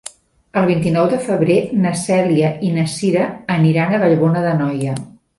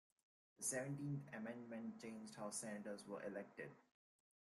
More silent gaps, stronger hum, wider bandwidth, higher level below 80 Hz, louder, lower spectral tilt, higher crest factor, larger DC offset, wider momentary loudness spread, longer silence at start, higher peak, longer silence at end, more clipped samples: neither; neither; about the same, 11.5 kHz vs 12.5 kHz; first, -52 dBFS vs -88 dBFS; first, -16 LUFS vs -50 LUFS; first, -7 dB/octave vs -4.5 dB/octave; second, 14 dB vs 20 dB; neither; second, 6 LU vs 9 LU; about the same, 0.55 s vs 0.6 s; first, -2 dBFS vs -32 dBFS; second, 0.3 s vs 0.75 s; neither